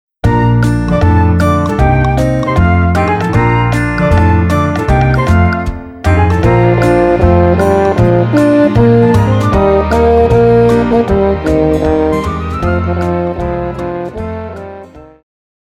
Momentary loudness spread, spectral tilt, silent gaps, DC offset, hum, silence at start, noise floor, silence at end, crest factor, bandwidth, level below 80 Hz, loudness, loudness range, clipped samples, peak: 9 LU; -8 dB/octave; none; under 0.1%; none; 0.25 s; -32 dBFS; 0.7 s; 10 dB; 12 kHz; -22 dBFS; -11 LUFS; 5 LU; under 0.1%; 0 dBFS